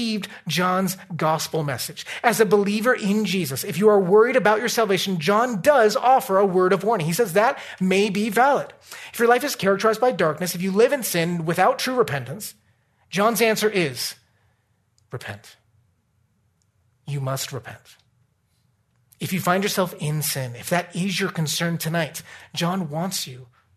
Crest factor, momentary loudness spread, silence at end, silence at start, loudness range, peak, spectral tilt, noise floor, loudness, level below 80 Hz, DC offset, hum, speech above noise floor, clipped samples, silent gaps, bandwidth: 18 dB; 12 LU; 0.3 s; 0 s; 15 LU; -4 dBFS; -4.5 dB/octave; -66 dBFS; -21 LUFS; -68 dBFS; under 0.1%; none; 45 dB; under 0.1%; none; 14 kHz